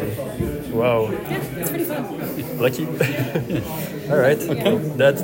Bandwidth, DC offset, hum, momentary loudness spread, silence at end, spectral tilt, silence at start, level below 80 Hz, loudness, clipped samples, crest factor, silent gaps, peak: 16.5 kHz; under 0.1%; none; 9 LU; 0 s; -6 dB/octave; 0 s; -46 dBFS; -22 LUFS; under 0.1%; 18 dB; none; -4 dBFS